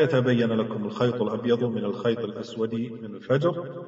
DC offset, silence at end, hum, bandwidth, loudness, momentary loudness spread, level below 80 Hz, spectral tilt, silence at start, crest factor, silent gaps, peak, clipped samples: under 0.1%; 0 s; none; 7.8 kHz; -26 LUFS; 9 LU; -66 dBFS; -6 dB/octave; 0 s; 16 dB; none; -10 dBFS; under 0.1%